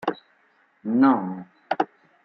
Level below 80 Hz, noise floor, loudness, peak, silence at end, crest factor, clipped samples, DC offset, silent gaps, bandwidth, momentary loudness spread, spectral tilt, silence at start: -74 dBFS; -63 dBFS; -24 LUFS; -6 dBFS; 0.4 s; 20 dB; under 0.1%; under 0.1%; none; 5.8 kHz; 19 LU; -8.5 dB/octave; 0 s